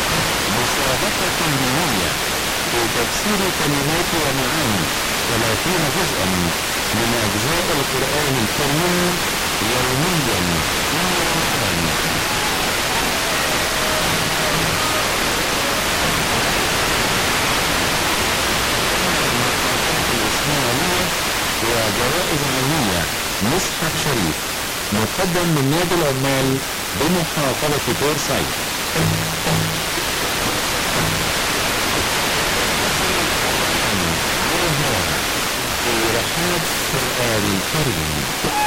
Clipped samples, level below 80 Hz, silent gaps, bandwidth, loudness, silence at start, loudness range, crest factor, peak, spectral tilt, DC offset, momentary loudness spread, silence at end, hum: under 0.1%; -36 dBFS; none; 17 kHz; -18 LUFS; 0 s; 2 LU; 14 dB; -6 dBFS; -3 dB/octave; under 0.1%; 2 LU; 0 s; none